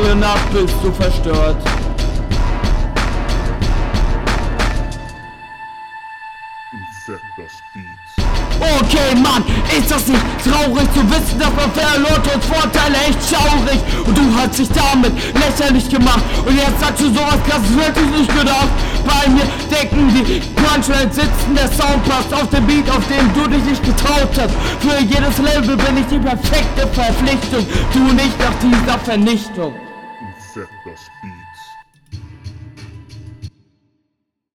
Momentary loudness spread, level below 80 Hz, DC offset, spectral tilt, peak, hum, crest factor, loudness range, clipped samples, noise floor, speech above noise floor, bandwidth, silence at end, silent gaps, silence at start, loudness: 19 LU; -20 dBFS; under 0.1%; -4.5 dB/octave; -2 dBFS; none; 14 dB; 11 LU; under 0.1%; -73 dBFS; 60 dB; 17.5 kHz; 1.05 s; none; 0 s; -14 LUFS